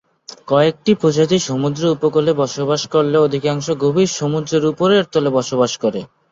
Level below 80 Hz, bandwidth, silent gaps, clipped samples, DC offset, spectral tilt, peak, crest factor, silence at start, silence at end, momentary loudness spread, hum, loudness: -56 dBFS; 7.8 kHz; none; under 0.1%; under 0.1%; -5.5 dB/octave; -2 dBFS; 14 dB; 0.45 s; 0.25 s; 5 LU; none; -16 LUFS